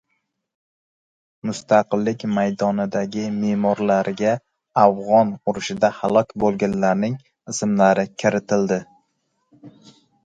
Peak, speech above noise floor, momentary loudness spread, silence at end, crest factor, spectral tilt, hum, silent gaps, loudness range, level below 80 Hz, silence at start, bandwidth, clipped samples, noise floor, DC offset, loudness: 0 dBFS; 54 dB; 9 LU; 0.55 s; 20 dB; -6 dB/octave; none; none; 3 LU; -58 dBFS; 1.45 s; 9.2 kHz; under 0.1%; -73 dBFS; under 0.1%; -20 LUFS